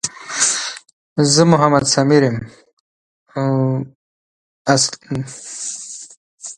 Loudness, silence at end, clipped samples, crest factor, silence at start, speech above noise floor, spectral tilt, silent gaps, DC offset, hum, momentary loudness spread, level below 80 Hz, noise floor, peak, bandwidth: -16 LUFS; 0.05 s; under 0.1%; 18 dB; 0.05 s; over 75 dB; -4 dB/octave; 0.93-1.16 s, 2.73-3.26 s, 3.95-4.65 s, 6.17-6.38 s; under 0.1%; none; 19 LU; -52 dBFS; under -90 dBFS; 0 dBFS; 11.5 kHz